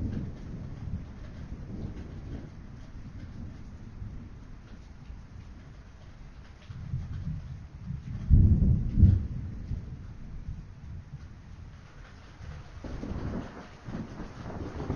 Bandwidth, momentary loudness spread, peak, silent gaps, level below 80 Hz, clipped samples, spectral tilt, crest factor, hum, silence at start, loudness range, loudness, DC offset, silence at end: 6.8 kHz; 25 LU; -8 dBFS; none; -36 dBFS; under 0.1%; -9 dB/octave; 24 dB; none; 0 s; 18 LU; -32 LUFS; under 0.1%; 0 s